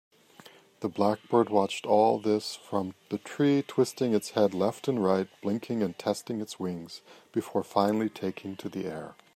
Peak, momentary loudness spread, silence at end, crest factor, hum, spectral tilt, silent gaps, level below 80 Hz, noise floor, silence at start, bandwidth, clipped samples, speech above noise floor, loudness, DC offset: -8 dBFS; 12 LU; 0.25 s; 20 dB; none; -6 dB/octave; none; -76 dBFS; -54 dBFS; 0.8 s; 15.5 kHz; under 0.1%; 26 dB; -29 LUFS; under 0.1%